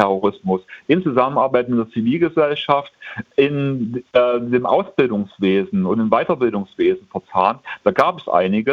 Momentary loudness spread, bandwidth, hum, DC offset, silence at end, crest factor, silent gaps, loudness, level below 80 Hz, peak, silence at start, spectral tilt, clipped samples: 6 LU; 7 kHz; none; under 0.1%; 0 s; 18 dB; none; -18 LUFS; -58 dBFS; 0 dBFS; 0 s; -8 dB/octave; under 0.1%